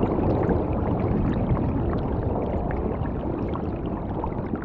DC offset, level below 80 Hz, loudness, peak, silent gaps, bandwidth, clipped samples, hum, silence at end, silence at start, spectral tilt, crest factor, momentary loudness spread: under 0.1%; -32 dBFS; -26 LUFS; -10 dBFS; none; 4.9 kHz; under 0.1%; none; 0 s; 0 s; -11.5 dB/octave; 14 dB; 6 LU